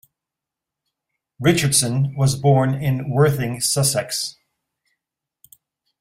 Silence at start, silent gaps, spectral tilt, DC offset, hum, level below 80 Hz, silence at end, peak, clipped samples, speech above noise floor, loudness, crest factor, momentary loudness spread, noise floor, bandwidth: 1.4 s; none; -4.5 dB/octave; under 0.1%; none; -54 dBFS; 1.7 s; -4 dBFS; under 0.1%; 67 dB; -19 LUFS; 18 dB; 6 LU; -86 dBFS; 16 kHz